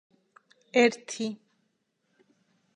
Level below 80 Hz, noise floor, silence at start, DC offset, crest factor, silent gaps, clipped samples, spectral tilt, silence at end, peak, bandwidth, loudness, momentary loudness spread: -86 dBFS; -76 dBFS; 0.75 s; under 0.1%; 24 dB; none; under 0.1%; -3.5 dB/octave; 1.4 s; -8 dBFS; 10 kHz; -27 LUFS; 13 LU